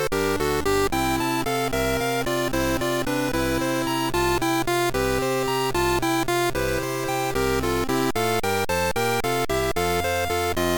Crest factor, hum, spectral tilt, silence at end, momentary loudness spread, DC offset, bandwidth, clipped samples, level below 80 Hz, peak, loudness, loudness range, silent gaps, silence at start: 14 dB; none; -4 dB/octave; 0 s; 2 LU; 0.2%; 19 kHz; under 0.1%; -38 dBFS; -10 dBFS; -23 LUFS; 1 LU; none; 0 s